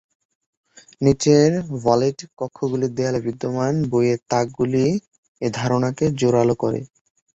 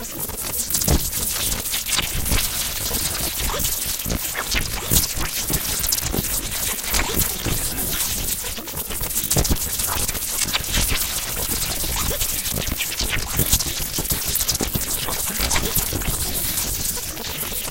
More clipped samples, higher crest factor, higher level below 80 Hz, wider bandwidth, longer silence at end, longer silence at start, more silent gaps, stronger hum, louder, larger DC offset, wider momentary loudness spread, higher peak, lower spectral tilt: neither; about the same, 18 dB vs 22 dB; second, -52 dBFS vs -30 dBFS; second, 8.4 kHz vs 17.5 kHz; first, 0.5 s vs 0 s; first, 1 s vs 0 s; first, 2.33-2.37 s, 5.18-5.35 s vs none; neither; about the same, -20 LUFS vs -21 LUFS; neither; first, 11 LU vs 4 LU; about the same, -2 dBFS vs 0 dBFS; first, -6.5 dB/octave vs -2 dB/octave